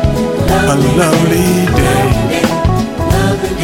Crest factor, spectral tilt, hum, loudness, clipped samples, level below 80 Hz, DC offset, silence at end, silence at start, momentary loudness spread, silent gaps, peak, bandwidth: 10 dB; -5.5 dB/octave; none; -12 LUFS; under 0.1%; -22 dBFS; under 0.1%; 0 s; 0 s; 4 LU; none; 0 dBFS; 17.5 kHz